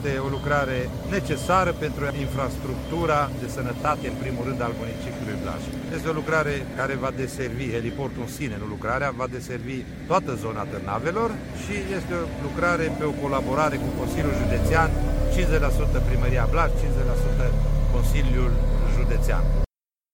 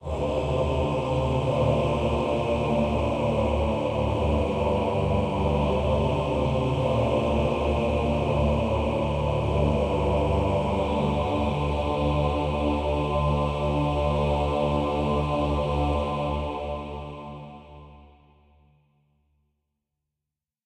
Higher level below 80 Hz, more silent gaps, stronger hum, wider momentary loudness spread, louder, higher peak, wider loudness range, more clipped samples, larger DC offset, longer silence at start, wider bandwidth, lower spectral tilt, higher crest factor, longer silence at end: first, -28 dBFS vs -34 dBFS; neither; neither; first, 8 LU vs 3 LU; about the same, -26 LUFS vs -25 LUFS; first, -6 dBFS vs -10 dBFS; about the same, 4 LU vs 5 LU; neither; neither; about the same, 0 s vs 0 s; first, 16.5 kHz vs 9.6 kHz; about the same, -6.5 dB/octave vs -7.5 dB/octave; about the same, 16 dB vs 14 dB; second, 0.5 s vs 2.6 s